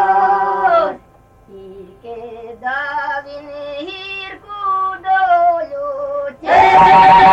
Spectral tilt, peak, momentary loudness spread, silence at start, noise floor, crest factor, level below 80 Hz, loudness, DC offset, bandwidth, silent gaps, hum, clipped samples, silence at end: -5 dB/octave; 0 dBFS; 23 LU; 0 s; -47 dBFS; 14 dB; -46 dBFS; -13 LUFS; under 0.1%; 8.4 kHz; none; none; under 0.1%; 0 s